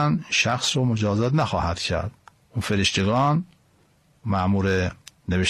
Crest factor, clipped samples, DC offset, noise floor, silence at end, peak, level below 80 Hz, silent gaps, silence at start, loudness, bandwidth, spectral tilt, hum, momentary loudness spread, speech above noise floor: 16 dB; under 0.1%; under 0.1%; -60 dBFS; 0 s; -8 dBFS; -44 dBFS; none; 0 s; -23 LUFS; 13 kHz; -5 dB/octave; none; 12 LU; 38 dB